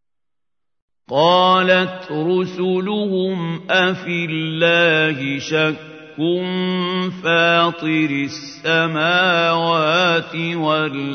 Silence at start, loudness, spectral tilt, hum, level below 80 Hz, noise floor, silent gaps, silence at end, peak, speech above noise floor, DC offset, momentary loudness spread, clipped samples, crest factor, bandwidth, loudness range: 1.1 s; -17 LUFS; -5.5 dB/octave; none; -68 dBFS; -88 dBFS; none; 0 s; 0 dBFS; 70 dB; under 0.1%; 10 LU; under 0.1%; 18 dB; 6.6 kHz; 2 LU